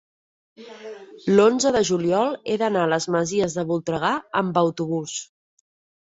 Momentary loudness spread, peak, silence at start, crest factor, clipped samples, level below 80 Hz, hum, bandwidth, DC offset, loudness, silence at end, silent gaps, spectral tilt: 14 LU; -4 dBFS; 0.6 s; 18 dB; under 0.1%; -60 dBFS; none; 8.2 kHz; under 0.1%; -22 LUFS; 0.8 s; none; -5 dB/octave